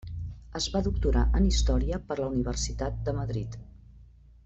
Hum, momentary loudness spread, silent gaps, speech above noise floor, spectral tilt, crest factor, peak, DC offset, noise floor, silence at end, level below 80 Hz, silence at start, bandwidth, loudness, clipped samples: none; 14 LU; none; 26 dB; -5.5 dB/octave; 16 dB; -12 dBFS; under 0.1%; -53 dBFS; 0.4 s; -30 dBFS; 0.05 s; 8.2 kHz; -29 LUFS; under 0.1%